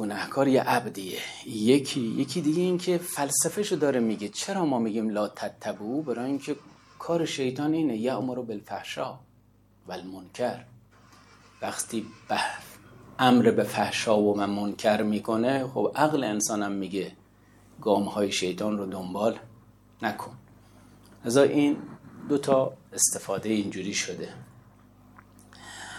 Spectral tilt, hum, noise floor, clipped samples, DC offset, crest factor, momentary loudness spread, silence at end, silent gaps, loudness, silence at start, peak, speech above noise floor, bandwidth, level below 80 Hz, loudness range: -4 dB/octave; 50 Hz at -55 dBFS; -60 dBFS; under 0.1%; under 0.1%; 20 dB; 15 LU; 0 s; none; -27 LUFS; 0 s; -8 dBFS; 33 dB; 16.5 kHz; -66 dBFS; 9 LU